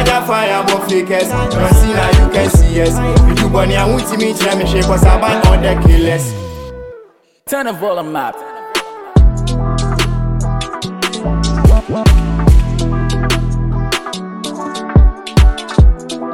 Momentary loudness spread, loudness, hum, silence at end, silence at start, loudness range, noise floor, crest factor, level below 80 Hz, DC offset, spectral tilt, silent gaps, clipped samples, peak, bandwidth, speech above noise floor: 11 LU; -13 LUFS; none; 0 s; 0 s; 5 LU; -42 dBFS; 12 dB; -14 dBFS; under 0.1%; -5.5 dB/octave; none; under 0.1%; 0 dBFS; 16.5 kHz; 32 dB